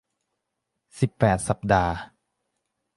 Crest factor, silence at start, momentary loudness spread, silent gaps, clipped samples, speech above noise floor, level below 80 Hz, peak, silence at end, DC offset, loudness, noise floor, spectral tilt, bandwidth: 22 dB; 0.95 s; 7 LU; none; under 0.1%; 58 dB; -44 dBFS; -6 dBFS; 0.9 s; under 0.1%; -24 LUFS; -81 dBFS; -6 dB/octave; 11.5 kHz